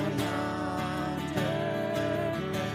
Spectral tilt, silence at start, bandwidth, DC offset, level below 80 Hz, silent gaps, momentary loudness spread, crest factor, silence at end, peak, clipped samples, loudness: -6 dB/octave; 0 s; 15.5 kHz; under 0.1%; -54 dBFS; none; 2 LU; 14 dB; 0 s; -16 dBFS; under 0.1%; -31 LUFS